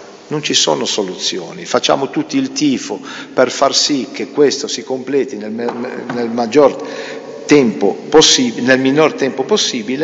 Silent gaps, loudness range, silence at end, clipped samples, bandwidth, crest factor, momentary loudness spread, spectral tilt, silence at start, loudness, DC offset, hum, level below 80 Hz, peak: none; 4 LU; 0 s; under 0.1%; 8 kHz; 14 dB; 12 LU; -3 dB/octave; 0 s; -14 LUFS; under 0.1%; none; -54 dBFS; 0 dBFS